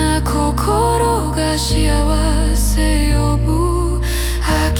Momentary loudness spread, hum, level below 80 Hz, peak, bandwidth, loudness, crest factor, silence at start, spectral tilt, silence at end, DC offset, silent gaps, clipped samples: 3 LU; none; -18 dBFS; -4 dBFS; 18 kHz; -16 LUFS; 12 dB; 0 s; -5 dB/octave; 0 s; under 0.1%; none; under 0.1%